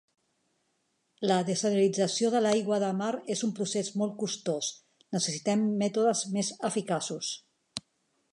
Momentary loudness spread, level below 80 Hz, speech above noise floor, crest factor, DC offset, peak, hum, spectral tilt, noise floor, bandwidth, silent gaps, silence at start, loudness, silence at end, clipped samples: 9 LU; -78 dBFS; 47 dB; 20 dB; under 0.1%; -10 dBFS; none; -4.5 dB/octave; -76 dBFS; 11.5 kHz; none; 1.2 s; -29 LUFS; 0.55 s; under 0.1%